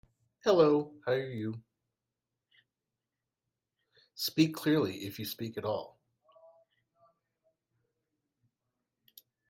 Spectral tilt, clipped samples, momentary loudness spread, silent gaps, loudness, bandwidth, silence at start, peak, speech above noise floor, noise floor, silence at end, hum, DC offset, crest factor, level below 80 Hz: -5.5 dB/octave; under 0.1%; 14 LU; none; -31 LUFS; 16 kHz; 0.45 s; -12 dBFS; 59 dB; -89 dBFS; 3.65 s; none; under 0.1%; 22 dB; -76 dBFS